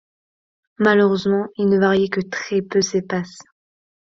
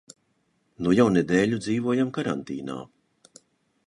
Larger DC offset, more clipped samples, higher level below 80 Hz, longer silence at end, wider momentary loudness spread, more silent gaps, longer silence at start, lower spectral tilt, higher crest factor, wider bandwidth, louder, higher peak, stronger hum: neither; neither; about the same, -60 dBFS vs -58 dBFS; second, 0.65 s vs 1.05 s; second, 9 LU vs 14 LU; neither; about the same, 0.8 s vs 0.8 s; about the same, -5.5 dB/octave vs -6.5 dB/octave; about the same, 18 dB vs 20 dB; second, 7.6 kHz vs 11 kHz; first, -19 LUFS vs -24 LUFS; first, -2 dBFS vs -6 dBFS; neither